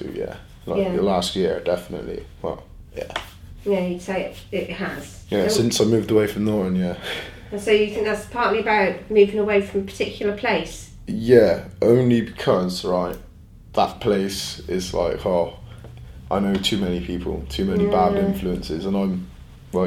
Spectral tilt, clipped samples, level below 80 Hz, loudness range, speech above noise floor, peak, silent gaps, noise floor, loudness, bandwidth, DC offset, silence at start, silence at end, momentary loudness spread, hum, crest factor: -5.5 dB/octave; under 0.1%; -42 dBFS; 6 LU; 23 dB; -2 dBFS; none; -44 dBFS; -22 LUFS; 16 kHz; under 0.1%; 0 s; 0 s; 14 LU; none; 20 dB